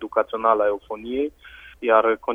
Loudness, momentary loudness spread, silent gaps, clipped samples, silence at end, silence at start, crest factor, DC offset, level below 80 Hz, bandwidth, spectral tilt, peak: -22 LUFS; 11 LU; none; under 0.1%; 0 s; 0 s; 20 dB; under 0.1%; -54 dBFS; 3.7 kHz; -6 dB/octave; -2 dBFS